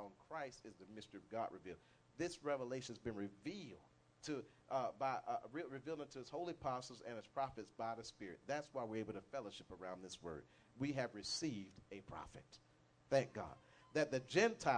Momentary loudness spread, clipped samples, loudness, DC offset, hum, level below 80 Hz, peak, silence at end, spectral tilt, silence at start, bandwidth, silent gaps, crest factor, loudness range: 16 LU; under 0.1%; -46 LUFS; under 0.1%; none; -74 dBFS; -22 dBFS; 0 s; -4.5 dB/octave; 0 s; 10 kHz; none; 24 dB; 3 LU